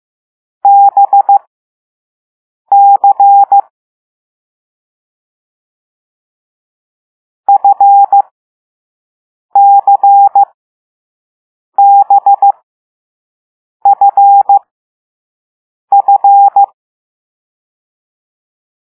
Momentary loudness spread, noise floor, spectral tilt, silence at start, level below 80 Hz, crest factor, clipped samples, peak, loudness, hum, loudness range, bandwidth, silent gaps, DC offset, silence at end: 8 LU; under -90 dBFS; -6.5 dB/octave; 0.65 s; -74 dBFS; 10 dB; under 0.1%; 0 dBFS; -7 LUFS; none; 3 LU; 1.5 kHz; 1.47-2.65 s, 3.70-7.44 s, 8.31-9.49 s, 10.54-11.72 s, 12.63-13.80 s, 14.71-15.88 s; under 0.1%; 2.3 s